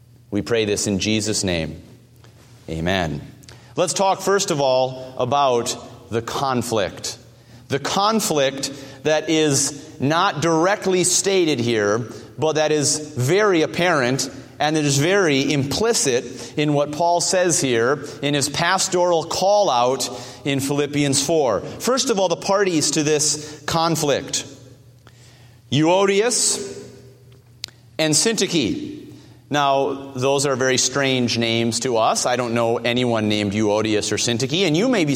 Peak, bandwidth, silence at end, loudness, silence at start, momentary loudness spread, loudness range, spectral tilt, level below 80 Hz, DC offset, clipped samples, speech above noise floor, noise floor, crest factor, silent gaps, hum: -2 dBFS; 16.5 kHz; 0 s; -19 LUFS; 0.3 s; 10 LU; 4 LU; -3.5 dB/octave; -52 dBFS; under 0.1%; under 0.1%; 28 dB; -47 dBFS; 18 dB; none; none